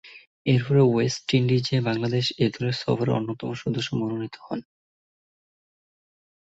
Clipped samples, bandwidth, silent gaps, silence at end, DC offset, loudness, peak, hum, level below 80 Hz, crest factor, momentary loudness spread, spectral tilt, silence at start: under 0.1%; 8 kHz; 0.27-0.45 s; 1.9 s; under 0.1%; -24 LUFS; -8 dBFS; none; -58 dBFS; 18 dB; 12 LU; -6.5 dB/octave; 0.05 s